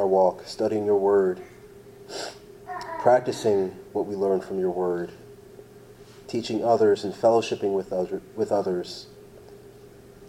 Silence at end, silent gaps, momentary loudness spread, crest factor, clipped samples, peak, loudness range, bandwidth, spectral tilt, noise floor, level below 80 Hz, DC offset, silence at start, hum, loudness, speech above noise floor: 0 s; none; 17 LU; 20 dB; under 0.1%; -6 dBFS; 3 LU; 15 kHz; -6 dB/octave; -48 dBFS; -62 dBFS; under 0.1%; 0 s; none; -25 LUFS; 24 dB